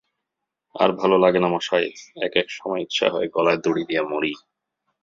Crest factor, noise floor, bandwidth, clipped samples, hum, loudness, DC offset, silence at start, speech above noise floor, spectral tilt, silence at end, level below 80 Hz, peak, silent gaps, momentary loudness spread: 20 dB; -83 dBFS; 7.6 kHz; under 0.1%; none; -22 LUFS; under 0.1%; 0.75 s; 61 dB; -5 dB/octave; 0.65 s; -64 dBFS; -2 dBFS; none; 10 LU